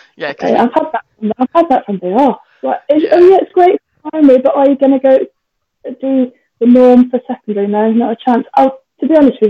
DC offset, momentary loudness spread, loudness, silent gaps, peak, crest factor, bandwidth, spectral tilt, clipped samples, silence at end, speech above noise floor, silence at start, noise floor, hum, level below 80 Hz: under 0.1%; 13 LU; -11 LUFS; none; 0 dBFS; 10 dB; 6.2 kHz; -8 dB/octave; under 0.1%; 0 s; 44 dB; 0.2 s; -54 dBFS; none; -54 dBFS